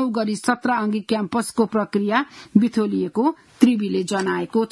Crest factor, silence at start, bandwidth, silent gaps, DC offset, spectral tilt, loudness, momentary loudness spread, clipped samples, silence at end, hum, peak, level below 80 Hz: 20 dB; 0 s; 12 kHz; none; under 0.1%; -5.5 dB/octave; -21 LUFS; 4 LU; under 0.1%; 0.05 s; none; 0 dBFS; -64 dBFS